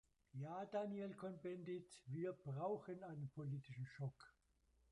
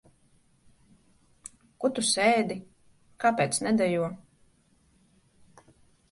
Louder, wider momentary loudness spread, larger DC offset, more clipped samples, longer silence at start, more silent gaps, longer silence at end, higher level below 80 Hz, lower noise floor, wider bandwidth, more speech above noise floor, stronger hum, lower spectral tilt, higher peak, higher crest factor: second, -50 LUFS vs -26 LUFS; second, 8 LU vs 24 LU; neither; neither; second, 0.35 s vs 1.8 s; neither; second, 0.6 s vs 1.95 s; second, -82 dBFS vs -68 dBFS; first, -80 dBFS vs -65 dBFS; about the same, 11 kHz vs 11.5 kHz; second, 30 dB vs 39 dB; neither; first, -8 dB/octave vs -3.5 dB/octave; second, -34 dBFS vs -10 dBFS; about the same, 16 dB vs 20 dB